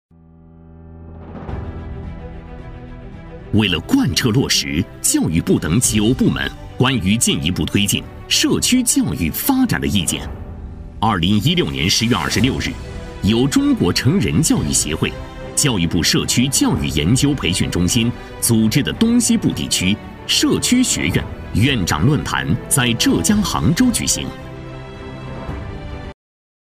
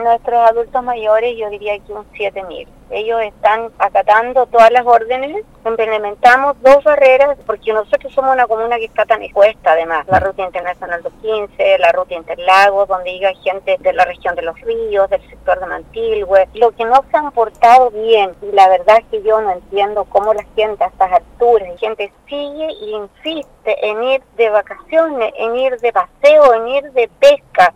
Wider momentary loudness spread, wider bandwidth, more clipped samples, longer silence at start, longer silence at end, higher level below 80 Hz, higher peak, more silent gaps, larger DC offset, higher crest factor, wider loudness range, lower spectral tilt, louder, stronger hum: first, 18 LU vs 13 LU; first, 16 kHz vs 12.5 kHz; neither; first, 0.55 s vs 0 s; first, 0.6 s vs 0.05 s; first, -34 dBFS vs -44 dBFS; about the same, -2 dBFS vs 0 dBFS; neither; neither; about the same, 16 dB vs 14 dB; second, 3 LU vs 6 LU; about the same, -4 dB/octave vs -4 dB/octave; second, -16 LUFS vs -13 LUFS; neither